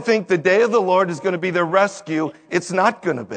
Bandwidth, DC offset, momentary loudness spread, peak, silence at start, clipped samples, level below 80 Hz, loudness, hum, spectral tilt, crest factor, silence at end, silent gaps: 9.4 kHz; under 0.1%; 8 LU; -2 dBFS; 0 s; under 0.1%; -70 dBFS; -19 LUFS; none; -5.5 dB/octave; 18 dB; 0 s; none